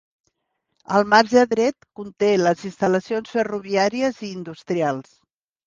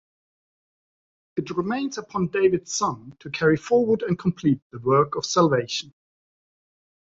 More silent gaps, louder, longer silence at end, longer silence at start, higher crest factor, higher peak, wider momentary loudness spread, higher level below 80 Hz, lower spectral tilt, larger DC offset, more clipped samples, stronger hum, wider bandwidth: second, none vs 4.62-4.70 s; first, -20 LUFS vs -23 LUFS; second, 0.65 s vs 1.35 s; second, 0.9 s vs 1.35 s; about the same, 20 dB vs 20 dB; first, 0 dBFS vs -6 dBFS; first, 16 LU vs 10 LU; about the same, -62 dBFS vs -60 dBFS; about the same, -5 dB/octave vs -5 dB/octave; neither; neither; neither; first, 9.6 kHz vs 7.8 kHz